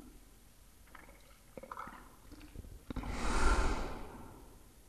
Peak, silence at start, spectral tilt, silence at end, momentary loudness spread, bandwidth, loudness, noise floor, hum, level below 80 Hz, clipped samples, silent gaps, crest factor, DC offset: -16 dBFS; 0 s; -4.5 dB/octave; 0.2 s; 27 LU; 13.5 kHz; -39 LUFS; -61 dBFS; none; -40 dBFS; under 0.1%; none; 22 dB; under 0.1%